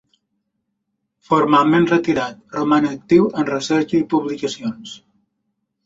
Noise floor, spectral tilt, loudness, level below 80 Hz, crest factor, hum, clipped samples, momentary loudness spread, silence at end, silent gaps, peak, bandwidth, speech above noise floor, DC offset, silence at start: -75 dBFS; -6 dB/octave; -18 LUFS; -58 dBFS; 18 dB; none; under 0.1%; 13 LU; 0.9 s; none; -2 dBFS; 8 kHz; 57 dB; under 0.1%; 1.3 s